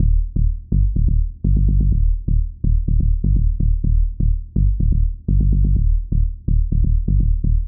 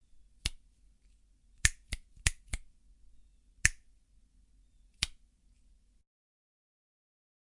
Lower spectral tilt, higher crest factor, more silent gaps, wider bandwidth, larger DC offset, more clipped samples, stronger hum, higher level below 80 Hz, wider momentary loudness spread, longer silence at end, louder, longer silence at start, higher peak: first, -22 dB/octave vs -0.5 dB/octave; second, 10 dB vs 38 dB; neither; second, 0.7 kHz vs 11.5 kHz; first, 0.3% vs under 0.1%; neither; neither; first, -16 dBFS vs -46 dBFS; second, 4 LU vs 14 LU; second, 0 s vs 2.35 s; first, -20 LUFS vs -34 LUFS; second, 0 s vs 0.45 s; second, -6 dBFS vs -2 dBFS